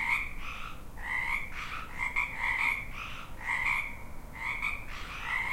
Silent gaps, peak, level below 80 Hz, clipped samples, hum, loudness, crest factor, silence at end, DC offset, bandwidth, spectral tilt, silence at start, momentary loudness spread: none; -16 dBFS; -44 dBFS; under 0.1%; none; -33 LUFS; 18 dB; 0 s; under 0.1%; 16 kHz; -3 dB/octave; 0 s; 13 LU